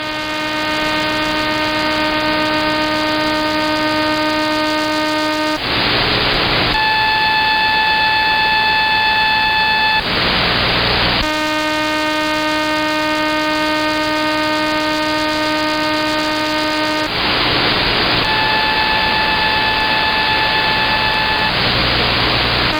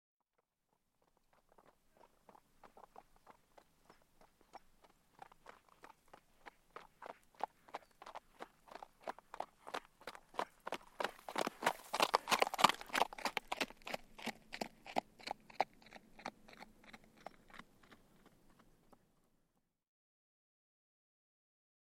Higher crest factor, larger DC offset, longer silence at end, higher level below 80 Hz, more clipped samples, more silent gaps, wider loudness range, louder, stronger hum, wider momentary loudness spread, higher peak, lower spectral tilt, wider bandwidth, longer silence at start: second, 14 dB vs 36 dB; neither; second, 0 s vs 3.95 s; first, -36 dBFS vs -72 dBFS; neither; neither; second, 3 LU vs 26 LU; first, -14 LUFS vs -41 LUFS; neither; second, 4 LU vs 26 LU; first, -2 dBFS vs -10 dBFS; first, -4 dB/octave vs -2 dB/octave; first, over 20 kHz vs 16.5 kHz; second, 0 s vs 2.65 s